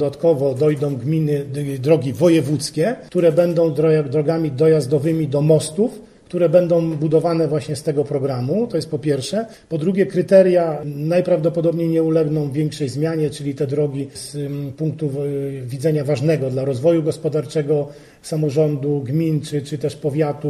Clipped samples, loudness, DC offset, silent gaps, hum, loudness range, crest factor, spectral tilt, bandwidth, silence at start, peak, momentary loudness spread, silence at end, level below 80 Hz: under 0.1%; -19 LUFS; under 0.1%; none; none; 5 LU; 16 dB; -7.5 dB/octave; 13.5 kHz; 0 s; -2 dBFS; 9 LU; 0 s; -56 dBFS